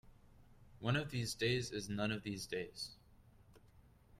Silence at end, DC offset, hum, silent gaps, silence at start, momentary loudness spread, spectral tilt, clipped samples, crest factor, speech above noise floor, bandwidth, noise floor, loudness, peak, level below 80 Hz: 0.05 s; under 0.1%; none; none; 0.05 s; 9 LU; -4.5 dB/octave; under 0.1%; 20 dB; 25 dB; 15 kHz; -65 dBFS; -40 LUFS; -22 dBFS; -64 dBFS